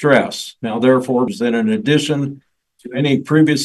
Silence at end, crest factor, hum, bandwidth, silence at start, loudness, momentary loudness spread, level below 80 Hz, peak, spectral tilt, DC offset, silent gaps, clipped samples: 0 s; 16 dB; none; 12.5 kHz; 0 s; -17 LUFS; 10 LU; -62 dBFS; 0 dBFS; -5.5 dB/octave; under 0.1%; none; under 0.1%